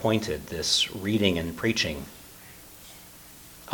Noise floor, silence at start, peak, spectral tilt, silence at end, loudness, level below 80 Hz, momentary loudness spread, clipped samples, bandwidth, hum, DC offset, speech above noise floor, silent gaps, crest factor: -48 dBFS; 0 s; -6 dBFS; -3.5 dB/octave; 0 s; -26 LUFS; -50 dBFS; 22 LU; under 0.1%; 19 kHz; none; under 0.1%; 22 dB; none; 24 dB